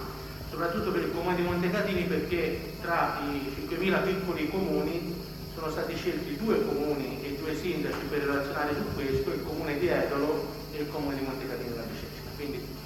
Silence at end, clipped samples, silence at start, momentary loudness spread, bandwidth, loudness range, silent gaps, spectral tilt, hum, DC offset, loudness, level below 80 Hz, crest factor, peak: 0 s; under 0.1%; 0 s; 9 LU; 17 kHz; 2 LU; none; -6 dB/octave; none; under 0.1%; -31 LUFS; -48 dBFS; 16 dB; -14 dBFS